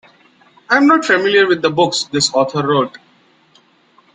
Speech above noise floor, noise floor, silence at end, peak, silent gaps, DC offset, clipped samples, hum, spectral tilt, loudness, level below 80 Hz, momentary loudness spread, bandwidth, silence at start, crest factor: 39 dB; -53 dBFS; 1.25 s; -2 dBFS; none; under 0.1%; under 0.1%; none; -3.5 dB/octave; -14 LUFS; -60 dBFS; 5 LU; 9.6 kHz; 0.7 s; 14 dB